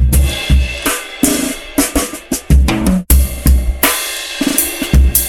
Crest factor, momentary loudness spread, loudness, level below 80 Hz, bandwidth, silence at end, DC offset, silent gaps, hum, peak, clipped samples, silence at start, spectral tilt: 12 dB; 6 LU; -14 LUFS; -14 dBFS; 20 kHz; 0 s; under 0.1%; none; none; 0 dBFS; under 0.1%; 0 s; -4 dB/octave